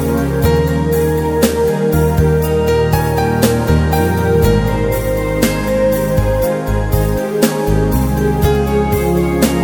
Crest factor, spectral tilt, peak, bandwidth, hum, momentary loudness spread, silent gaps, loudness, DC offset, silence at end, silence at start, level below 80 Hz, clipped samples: 14 dB; -6.5 dB/octave; 0 dBFS; 17.5 kHz; none; 3 LU; none; -14 LUFS; 0.1%; 0 s; 0 s; -22 dBFS; under 0.1%